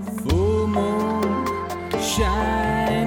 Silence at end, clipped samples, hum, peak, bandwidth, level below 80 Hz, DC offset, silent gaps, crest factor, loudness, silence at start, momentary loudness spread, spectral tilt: 0 s; under 0.1%; none; -8 dBFS; 17 kHz; -32 dBFS; under 0.1%; none; 14 dB; -22 LUFS; 0 s; 5 LU; -5.5 dB/octave